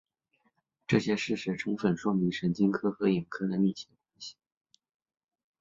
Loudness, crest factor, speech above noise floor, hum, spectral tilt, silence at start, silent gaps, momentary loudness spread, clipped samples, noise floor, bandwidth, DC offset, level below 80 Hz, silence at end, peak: -30 LUFS; 22 dB; 46 dB; none; -6.5 dB/octave; 0.9 s; none; 17 LU; under 0.1%; -75 dBFS; 7.6 kHz; under 0.1%; -66 dBFS; 1.3 s; -10 dBFS